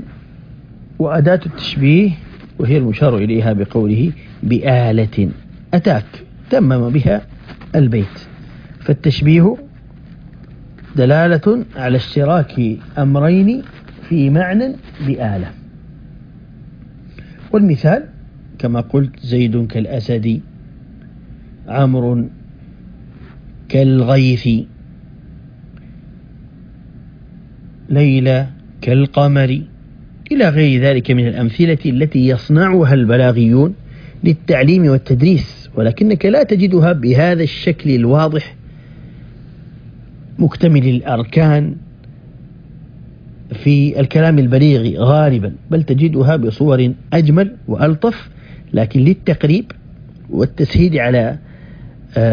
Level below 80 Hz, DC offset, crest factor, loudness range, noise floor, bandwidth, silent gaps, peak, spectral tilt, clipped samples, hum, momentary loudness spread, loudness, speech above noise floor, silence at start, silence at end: -38 dBFS; under 0.1%; 14 dB; 7 LU; -37 dBFS; 5.2 kHz; none; 0 dBFS; -9.5 dB/octave; under 0.1%; none; 11 LU; -14 LUFS; 25 dB; 0 s; 0 s